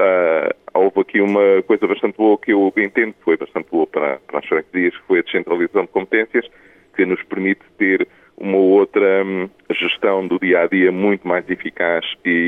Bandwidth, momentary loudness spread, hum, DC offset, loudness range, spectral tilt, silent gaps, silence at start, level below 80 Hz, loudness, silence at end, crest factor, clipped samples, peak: 3.9 kHz; 7 LU; none; under 0.1%; 3 LU; -8 dB/octave; none; 0 s; -64 dBFS; -17 LUFS; 0 s; 14 dB; under 0.1%; -2 dBFS